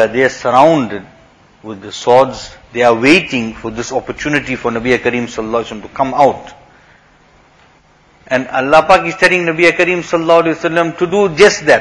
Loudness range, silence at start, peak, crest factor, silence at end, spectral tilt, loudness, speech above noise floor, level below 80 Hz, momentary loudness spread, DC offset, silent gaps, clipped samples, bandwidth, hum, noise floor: 6 LU; 0 s; 0 dBFS; 14 dB; 0 s; -4.5 dB/octave; -12 LUFS; 36 dB; -44 dBFS; 13 LU; under 0.1%; none; 0.3%; 11 kHz; none; -48 dBFS